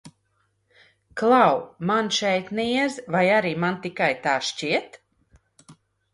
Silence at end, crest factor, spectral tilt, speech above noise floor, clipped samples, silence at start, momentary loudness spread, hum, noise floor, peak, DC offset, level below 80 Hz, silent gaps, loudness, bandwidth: 0.4 s; 20 dB; -4.5 dB/octave; 47 dB; under 0.1%; 0.05 s; 8 LU; none; -70 dBFS; -4 dBFS; under 0.1%; -64 dBFS; none; -22 LUFS; 11.5 kHz